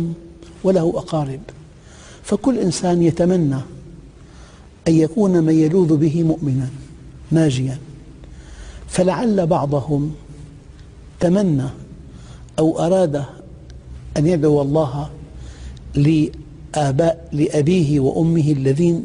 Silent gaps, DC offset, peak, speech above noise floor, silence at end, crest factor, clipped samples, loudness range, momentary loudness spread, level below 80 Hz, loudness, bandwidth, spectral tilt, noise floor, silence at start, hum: none; under 0.1%; -4 dBFS; 25 dB; 0 s; 14 dB; under 0.1%; 4 LU; 21 LU; -40 dBFS; -18 LUFS; 10.5 kHz; -7.5 dB/octave; -42 dBFS; 0 s; none